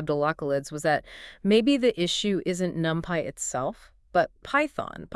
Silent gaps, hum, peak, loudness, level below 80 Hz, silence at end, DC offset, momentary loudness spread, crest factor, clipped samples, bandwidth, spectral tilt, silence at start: none; none; -8 dBFS; -26 LUFS; -56 dBFS; 0 s; under 0.1%; 8 LU; 18 dB; under 0.1%; 12 kHz; -4.5 dB/octave; 0 s